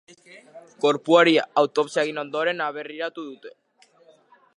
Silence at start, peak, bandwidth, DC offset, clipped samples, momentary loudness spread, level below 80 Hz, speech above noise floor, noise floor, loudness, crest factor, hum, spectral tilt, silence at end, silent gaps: 0.35 s; -2 dBFS; 11 kHz; under 0.1%; under 0.1%; 16 LU; -84 dBFS; 35 dB; -57 dBFS; -22 LUFS; 22 dB; none; -4.5 dB/octave; 1.05 s; none